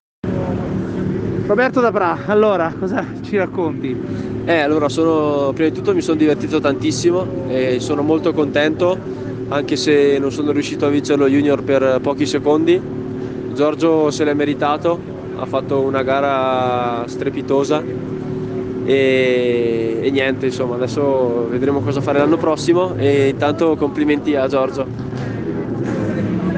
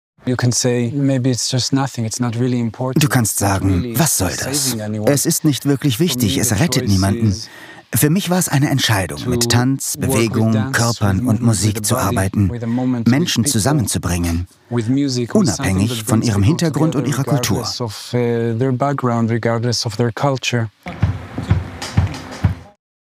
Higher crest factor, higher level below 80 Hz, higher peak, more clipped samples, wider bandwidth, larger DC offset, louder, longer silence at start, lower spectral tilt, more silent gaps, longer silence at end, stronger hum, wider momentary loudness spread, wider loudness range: about the same, 14 dB vs 16 dB; about the same, -46 dBFS vs -44 dBFS; second, -4 dBFS vs 0 dBFS; neither; second, 9.4 kHz vs 16 kHz; neither; about the same, -17 LUFS vs -17 LUFS; about the same, 0.25 s vs 0.25 s; first, -6.5 dB/octave vs -5 dB/octave; neither; second, 0 s vs 0.4 s; neither; first, 9 LU vs 6 LU; about the same, 2 LU vs 2 LU